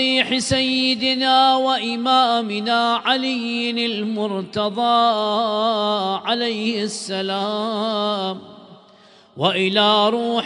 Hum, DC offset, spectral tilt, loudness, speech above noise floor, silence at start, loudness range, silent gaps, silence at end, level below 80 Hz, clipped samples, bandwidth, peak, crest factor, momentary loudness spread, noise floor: none; under 0.1%; -4 dB/octave; -19 LUFS; 30 dB; 0 s; 6 LU; none; 0 s; -58 dBFS; under 0.1%; 10.5 kHz; -2 dBFS; 18 dB; 8 LU; -50 dBFS